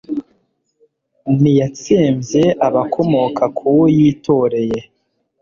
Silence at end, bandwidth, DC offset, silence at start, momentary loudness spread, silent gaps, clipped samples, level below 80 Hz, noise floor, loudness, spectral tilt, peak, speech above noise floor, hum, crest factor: 0.6 s; 7.4 kHz; under 0.1%; 0.1 s; 10 LU; none; under 0.1%; -50 dBFS; -62 dBFS; -15 LUFS; -7.5 dB/octave; -2 dBFS; 48 dB; none; 14 dB